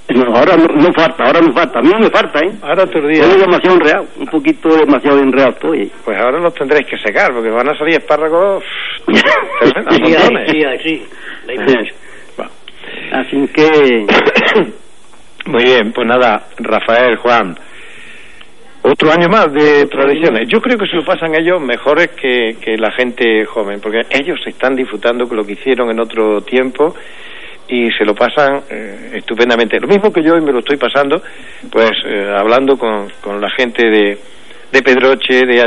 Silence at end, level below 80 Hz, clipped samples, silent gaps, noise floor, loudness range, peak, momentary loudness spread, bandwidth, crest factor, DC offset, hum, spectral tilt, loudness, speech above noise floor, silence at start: 0 s; -50 dBFS; under 0.1%; none; -43 dBFS; 5 LU; 0 dBFS; 11 LU; 11 kHz; 12 dB; 3%; none; -5.5 dB/octave; -11 LUFS; 32 dB; 0.1 s